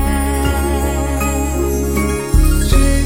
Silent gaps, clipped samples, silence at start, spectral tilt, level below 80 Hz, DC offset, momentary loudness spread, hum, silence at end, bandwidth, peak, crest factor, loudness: none; under 0.1%; 0 s; -5.5 dB/octave; -16 dBFS; under 0.1%; 3 LU; none; 0 s; 16.5 kHz; 0 dBFS; 14 dB; -16 LUFS